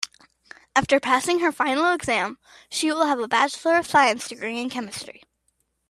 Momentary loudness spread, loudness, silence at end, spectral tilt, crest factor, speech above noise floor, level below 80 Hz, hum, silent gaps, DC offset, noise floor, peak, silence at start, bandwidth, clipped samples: 12 LU; -22 LUFS; 0.8 s; -3 dB/octave; 22 dB; 49 dB; -60 dBFS; none; none; under 0.1%; -71 dBFS; -2 dBFS; 0 s; 14.5 kHz; under 0.1%